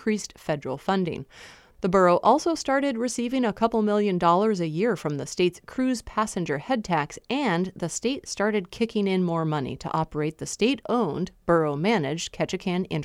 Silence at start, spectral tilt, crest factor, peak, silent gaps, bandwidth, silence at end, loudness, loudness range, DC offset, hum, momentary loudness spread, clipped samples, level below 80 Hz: 0 s; -5.5 dB/octave; 18 dB; -6 dBFS; none; 13.5 kHz; 0 s; -25 LUFS; 4 LU; under 0.1%; none; 9 LU; under 0.1%; -54 dBFS